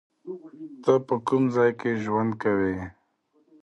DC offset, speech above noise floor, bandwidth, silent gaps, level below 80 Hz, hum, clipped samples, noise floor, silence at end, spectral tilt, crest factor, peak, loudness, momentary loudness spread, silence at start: under 0.1%; 43 dB; 9.6 kHz; none; -58 dBFS; none; under 0.1%; -67 dBFS; 0.7 s; -8 dB/octave; 18 dB; -8 dBFS; -25 LUFS; 18 LU; 0.25 s